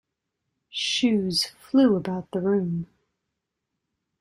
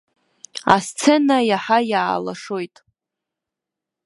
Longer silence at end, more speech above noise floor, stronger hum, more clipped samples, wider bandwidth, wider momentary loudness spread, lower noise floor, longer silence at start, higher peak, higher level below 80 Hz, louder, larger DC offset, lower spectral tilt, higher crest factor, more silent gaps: about the same, 1.35 s vs 1.4 s; second, 59 dB vs 67 dB; neither; neither; about the same, 12.5 kHz vs 11.5 kHz; about the same, 12 LU vs 13 LU; about the same, -82 dBFS vs -85 dBFS; first, 0.75 s vs 0.55 s; second, -8 dBFS vs 0 dBFS; about the same, -64 dBFS vs -62 dBFS; second, -24 LUFS vs -19 LUFS; neither; about the same, -5 dB/octave vs -4 dB/octave; about the same, 18 dB vs 20 dB; neither